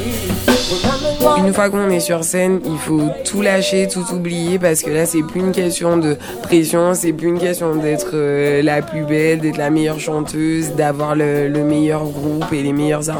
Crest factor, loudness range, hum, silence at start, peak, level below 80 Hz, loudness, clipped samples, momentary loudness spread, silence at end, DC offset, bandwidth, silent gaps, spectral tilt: 16 dB; 1 LU; none; 0 s; 0 dBFS; -40 dBFS; -16 LUFS; under 0.1%; 5 LU; 0 s; under 0.1%; 19.5 kHz; none; -5 dB/octave